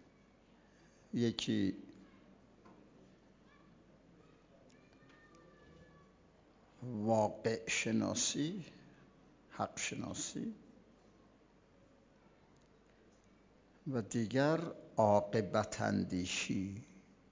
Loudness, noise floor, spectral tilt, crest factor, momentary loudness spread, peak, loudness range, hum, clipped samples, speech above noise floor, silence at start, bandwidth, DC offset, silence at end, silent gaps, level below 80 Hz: -37 LUFS; -66 dBFS; -4.5 dB/octave; 22 dB; 18 LU; -18 dBFS; 13 LU; none; under 0.1%; 30 dB; 1.15 s; 7.8 kHz; under 0.1%; 0.35 s; none; -68 dBFS